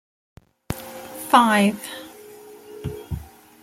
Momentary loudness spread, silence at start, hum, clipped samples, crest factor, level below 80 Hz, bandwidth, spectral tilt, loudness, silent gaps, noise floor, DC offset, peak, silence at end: 26 LU; 0.7 s; none; under 0.1%; 22 dB; -48 dBFS; 17 kHz; -4.5 dB/octave; -20 LUFS; none; -43 dBFS; under 0.1%; -2 dBFS; 0.4 s